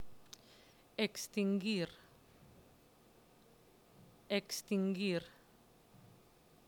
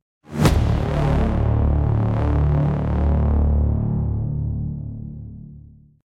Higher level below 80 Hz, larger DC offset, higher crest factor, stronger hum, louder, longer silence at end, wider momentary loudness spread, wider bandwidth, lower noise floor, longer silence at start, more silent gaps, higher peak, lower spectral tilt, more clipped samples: second, -76 dBFS vs -24 dBFS; neither; about the same, 20 dB vs 16 dB; neither; second, -38 LUFS vs -21 LUFS; first, 0.7 s vs 0.45 s; first, 22 LU vs 13 LU; first, 19.5 kHz vs 13.5 kHz; first, -66 dBFS vs -44 dBFS; second, 0 s vs 0.3 s; neither; second, -22 dBFS vs -4 dBFS; second, -5 dB/octave vs -8 dB/octave; neither